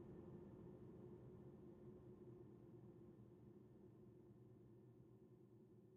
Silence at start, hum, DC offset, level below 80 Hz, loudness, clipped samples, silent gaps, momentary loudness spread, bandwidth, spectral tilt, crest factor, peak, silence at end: 0 s; none; under 0.1%; -80 dBFS; -64 LUFS; under 0.1%; none; 8 LU; 3.6 kHz; -9.5 dB/octave; 16 dB; -48 dBFS; 0 s